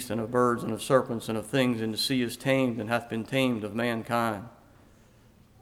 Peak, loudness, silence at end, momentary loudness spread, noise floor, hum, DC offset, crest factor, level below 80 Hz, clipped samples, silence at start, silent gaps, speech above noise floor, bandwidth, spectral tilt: -10 dBFS; -28 LUFS; 1.1 s; 6 LU; -57 dBFS; none; under 0.1%; 20 dB; -62 dBFS; under 0.1%; 0 s; none; 30 dB; 16.5 kHz; -5 dB/octave